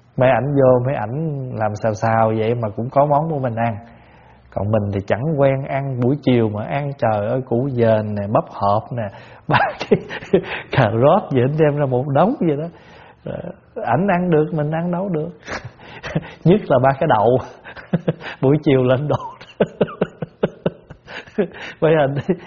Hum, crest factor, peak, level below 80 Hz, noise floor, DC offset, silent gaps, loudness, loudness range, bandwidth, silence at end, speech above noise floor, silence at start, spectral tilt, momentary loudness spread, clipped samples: none; 18 dB; 0 dBFS; -48 dBFS; -47 dBFS; under 0.1%; none; -19 LUFS; 3 LU; 7.2 kHz; 0 s; 29 dB; 0.15 s; -6.5 dB/octave; 13 LU; under 0.1%